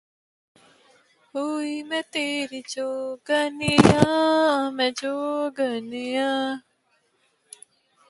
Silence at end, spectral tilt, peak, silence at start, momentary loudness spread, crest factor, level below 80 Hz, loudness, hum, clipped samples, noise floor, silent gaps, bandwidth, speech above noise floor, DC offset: 1.5 s; -5 dB/octave; 0 dBFS; 1.35 s; 13 LU; 24 dB; -52 dBFS; -23 LUFS; none; under 0.1%; -68 dBFS; none; 11.5 kHz; 45 dB; under 0.1%